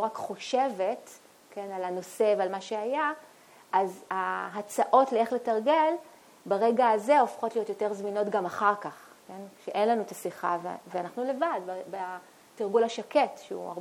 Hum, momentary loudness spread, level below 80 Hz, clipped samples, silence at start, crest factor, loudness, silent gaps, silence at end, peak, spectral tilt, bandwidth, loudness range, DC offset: none; 14 LU; -84 dBFS; under 0.1%; 0 s; 20 dB; -29 LUFS; none; 0 s; -8 dBFS; -4.5 dB/octave; 18 kHz; 6 LU; under 0.1%